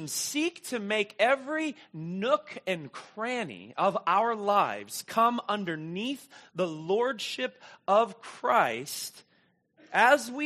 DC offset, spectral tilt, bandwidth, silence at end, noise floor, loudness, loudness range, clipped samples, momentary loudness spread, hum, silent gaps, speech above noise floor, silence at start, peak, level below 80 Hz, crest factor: under 0.1%; -3.5 dB/octave; 14 kHz; 0 s; -68 dBFS; -29 LUFS; 2 LU; under 0.1%; 11 LU; none; none; 39 dB; 0 s; -8 dBFS; -82 dBFS; 22 dB